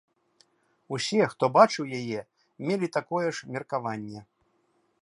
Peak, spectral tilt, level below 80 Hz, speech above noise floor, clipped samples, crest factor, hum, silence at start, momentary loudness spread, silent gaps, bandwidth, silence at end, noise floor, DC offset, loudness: -6 dBFS; -5 dB/octave; -74 dBFS; 44 dB; under 0.1%; 24 dB; none; 0.9 s; 16 LU; none; 11.5 kHz; 0.8 s; -70 dBFS; under 0.1%; -27 LUFS